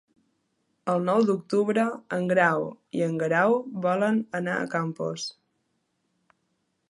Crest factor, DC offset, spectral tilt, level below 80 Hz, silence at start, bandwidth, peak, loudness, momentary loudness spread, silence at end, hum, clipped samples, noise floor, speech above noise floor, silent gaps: 20 dB; under 0.1%; -6 dB/octave; -76 dBFS; 0.85 s; 11.5 kHz; -8 dBFS; -26 LUFS; 9 LU; 1.6 s; none; under 0.1%; -75 dBFS; 50 dB; none